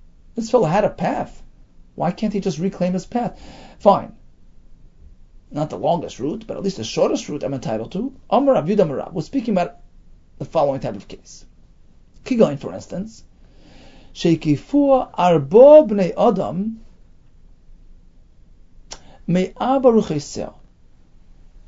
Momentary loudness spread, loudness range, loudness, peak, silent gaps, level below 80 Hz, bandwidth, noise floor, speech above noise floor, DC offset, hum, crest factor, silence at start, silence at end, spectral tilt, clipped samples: 17 LU; 10 LU; -19 LUFS; 0 dBFS; none; -46 dBFS; 7.8 kHz; -48 dBFS; 30 dB; under 0.1%; none; 20 dB; 0.35 s; 1.15 s; -7 dB/octave; under 0.1%